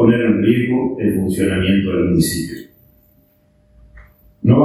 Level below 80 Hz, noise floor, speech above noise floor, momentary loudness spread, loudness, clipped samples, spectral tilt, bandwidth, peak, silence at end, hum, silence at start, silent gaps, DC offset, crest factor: -40 dBFS; -55 dBFS; 39 dB; 7 LU; -16 LUFS; under 0.1%; -6.5 dB/octave; 15 kHz; 0 dBFS; 0 s; none; 0 s; none; under 0.1%; 16 dB